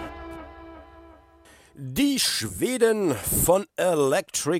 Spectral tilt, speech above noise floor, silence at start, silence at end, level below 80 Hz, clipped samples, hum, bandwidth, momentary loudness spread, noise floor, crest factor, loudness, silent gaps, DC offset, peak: -3.5 dB/octave; 30 dB; 0 s; 0 s; -46 dBFS; under 0.1%; none; 16.5 kHz; 20 LU; -54 dBFS; 18 dB; -23 LUFS; none; under 0.1%; -6 dBFS